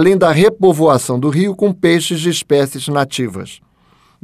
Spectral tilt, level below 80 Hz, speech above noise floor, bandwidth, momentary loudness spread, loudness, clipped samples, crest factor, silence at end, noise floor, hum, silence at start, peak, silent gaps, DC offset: -5.5 dB/octave; -54 dBFS; 39 dB; 15.5 kHz; 10 LU; -14 LUFS; under 0.1%; 12 dB; 0.7 s; -52 dBFS; none; 0 s; -2 dBFS; none; under 0.1%